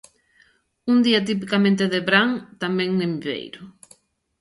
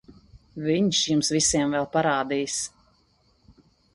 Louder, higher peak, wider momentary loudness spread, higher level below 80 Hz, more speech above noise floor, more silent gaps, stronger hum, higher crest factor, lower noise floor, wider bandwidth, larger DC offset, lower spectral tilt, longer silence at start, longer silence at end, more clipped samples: first, -21 LUFS vs -24 LUFS; first, -2 dBFS vs -8 dBFS; first, 14 LU vs 10 LU; second, -66 dBFS vs -54 dBFS; about the same, 39 dB vs 40 dB; neither; neither; about the same, 20 dB vs 18 dB; second, -60 dBFS vs -64 dBFS; about the same, 11.5 kHz vs 11.5 kHz; neither; first, -6 dB/octave vs -3.5 dB/octave; first, 0.85 s vs 0.1 s; second, 0.7 s vs 1.25 s; neither